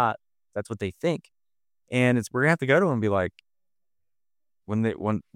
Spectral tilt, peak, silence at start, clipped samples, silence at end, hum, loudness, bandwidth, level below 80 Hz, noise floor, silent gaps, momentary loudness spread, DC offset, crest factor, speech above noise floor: -6.5 dB/octave; -6 dBFS; 0 s; under 0.1%; 0.15 s; none; -25 LUFS; 15.5 kHz; -62 dBFS; under -90 dBFS; none; 13 LU; under 0.1%; 22 dB; over 65 dB